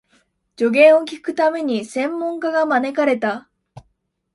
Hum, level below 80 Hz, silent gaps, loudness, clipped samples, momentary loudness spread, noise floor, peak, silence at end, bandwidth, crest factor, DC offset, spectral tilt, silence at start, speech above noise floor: none; -66 dBFS; none; -18 LUFS; under 0.1%; 11 LU; -68 dBFS; -2 dBFS; 0.55 s; 11.5 kHz; 18 dB; under 0.1%; -5 dB/octave; 0.6 s; 50 dB